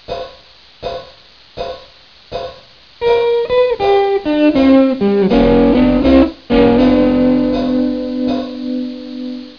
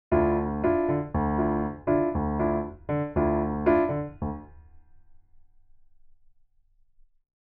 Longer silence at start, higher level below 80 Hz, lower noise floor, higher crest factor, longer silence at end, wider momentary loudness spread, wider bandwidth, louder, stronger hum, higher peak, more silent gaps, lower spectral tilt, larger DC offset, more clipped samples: about the same, 0.1 s vs 0.1 s; first, -32 dBFS vs -42 dBFS; second, -43 dBFS vs -62 dBFS; about the same, 14 dB vs 18 dB; second, 0.1 s vs 2.35 s; first, 16 LU vs 8 LU; first, 5.4 kHz vs 3.4 kHz; first, -13 LUFS vs -27 LUFS; neither; first, 0 dBFS vs -10 dBFS; neither; second, -8 dB/octave vs -12.5 dB/octave; first, 0.3% vs under 0.1%; neither